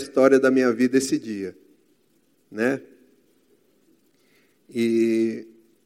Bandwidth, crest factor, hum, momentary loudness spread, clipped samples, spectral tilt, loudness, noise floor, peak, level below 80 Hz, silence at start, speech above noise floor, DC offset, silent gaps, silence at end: 15.5 kHz; 20 dB; none; 17 LU; under 0.1%; -5 dB/octave; -22 LUFS; -65 dBFS; -4 dBFS; -72 dBFS; 0 s; 44 dB; under 0.1%; none; 0.4 s